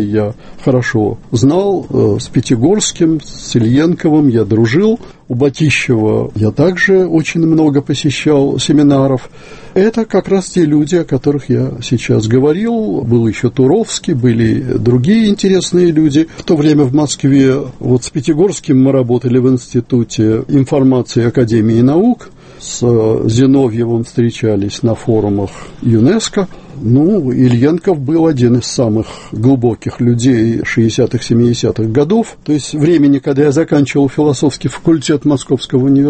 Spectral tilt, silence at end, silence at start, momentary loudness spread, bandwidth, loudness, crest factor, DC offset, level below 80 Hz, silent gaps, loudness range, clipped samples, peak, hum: -6.5 dB/octave; 0 s; 0 s; 6 LU; 8.8 kHz; -12 LUFS; 12 dB; under 0.1%; -40 dBFS; none; 2 LU; under 0.1%; 0 dBFS; none